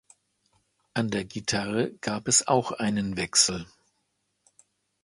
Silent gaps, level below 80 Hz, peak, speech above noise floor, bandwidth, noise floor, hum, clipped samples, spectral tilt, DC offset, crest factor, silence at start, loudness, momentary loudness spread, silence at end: none; -58 dBFS; -6 dBFS; 49 dB; 11.5 kHz; -76 dBFS; none; under 0.1%; -3 dB/octave; under 0.1%; 22 dB; 0.95 s; -25 LUFS; 10 LU; 1.4 s